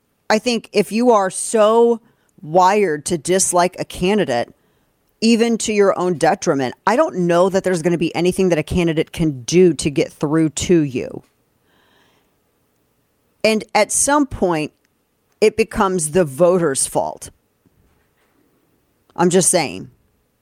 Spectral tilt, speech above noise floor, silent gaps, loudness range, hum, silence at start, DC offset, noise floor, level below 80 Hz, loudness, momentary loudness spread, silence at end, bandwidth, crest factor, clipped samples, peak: -4.5 dB/octave; 48 dB; none; 5 LU; none; 0.3 s; under 0.1%; -64 dBFS; -46 dBFS; -17 LUFS; 8 LU; 0.55 s; 16 kHz; 18 dB; under 0.1%; 0 dBFS